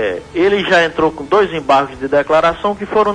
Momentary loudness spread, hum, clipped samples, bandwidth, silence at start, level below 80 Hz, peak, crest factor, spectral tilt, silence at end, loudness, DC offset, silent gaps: 5 LU; none; under 0.1%; 10.5 kHz; 0 s; -42 dBFS; -2 dBFS; 12 dB; -5 dB/octave; 0 s; -14 LUFS; under 0.1%; none